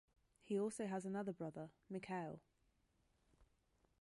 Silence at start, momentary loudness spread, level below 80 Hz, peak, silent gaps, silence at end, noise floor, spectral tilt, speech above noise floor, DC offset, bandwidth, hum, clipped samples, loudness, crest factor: 0.45 s; 10 LU; -80 dBFS; -32 dBFS; none; 0.6 s; -81 dBFS; -6.5 dB/octave; 35 dB; under 0.1%; 11.5 kHz; none; under 0.1%; -47 LUFS; 18 dB